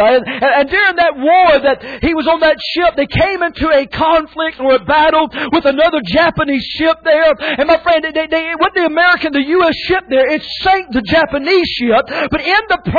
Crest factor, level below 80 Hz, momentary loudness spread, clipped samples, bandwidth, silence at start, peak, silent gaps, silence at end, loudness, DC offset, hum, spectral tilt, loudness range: 10 dB; -36 dBFS; 5 LU; under 0.1%; 5 kHz; 0 s; -2 dBFS; none; 0 s; -12 LUFS; under 0.1%; none; -6.5 dB/octave; 1 LU